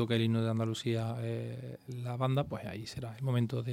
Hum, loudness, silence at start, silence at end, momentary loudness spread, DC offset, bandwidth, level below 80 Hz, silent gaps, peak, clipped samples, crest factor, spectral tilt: none; -35 LUFS; 0 s; 0 s; 11 LU; under 0.1%; 14.5 kHz; -66 dBFS; none; -16 dBFS; under 0.1%; 16 dB; -7 dB/octave